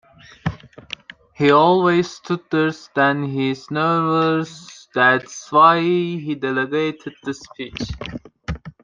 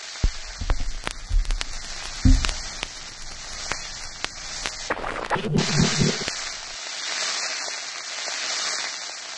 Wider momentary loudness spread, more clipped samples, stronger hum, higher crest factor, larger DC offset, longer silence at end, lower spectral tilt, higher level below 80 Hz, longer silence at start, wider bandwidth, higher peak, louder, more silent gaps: first, 18 LU vs 11 LU; neither; neither; second, 18 dB vs 26 dB; neither; first, 0.15 s vs 0 s; first, -6 dB/octave vs -3 dB/octave; second, -46 dBFS vs -30 dBFS; first, 0.45 s vs 0 s; second, 7.6 kHz vs 11.5 kHz; about the same, -2 dBFS vs 0 dBFS; first, -19 LUFS vs -27 LUFS; neither